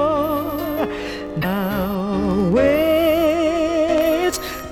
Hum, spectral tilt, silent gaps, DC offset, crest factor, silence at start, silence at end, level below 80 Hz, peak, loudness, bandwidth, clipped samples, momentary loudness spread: none; -5.5 dB/octave; none; under 0.1%; 12 dB; 0 s; 0 s; -38 dBFS; -6 dBFS; -19 LUFS; 19 kHz; under 0.1%; 8 LU